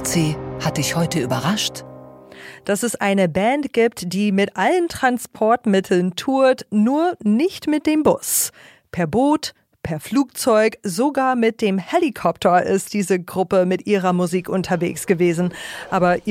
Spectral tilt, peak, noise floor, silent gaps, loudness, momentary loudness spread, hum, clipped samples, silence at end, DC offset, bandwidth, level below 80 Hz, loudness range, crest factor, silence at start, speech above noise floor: -5 dB/octave; -4 dBFS; -40 dBFS; none; -19 LUFS; 7 LU; none; under 0.1%; 0 s; under 0.1%; 16.5 kHz; -52 dBFS; 2 LU; 16 dB; 0 s; 22 dB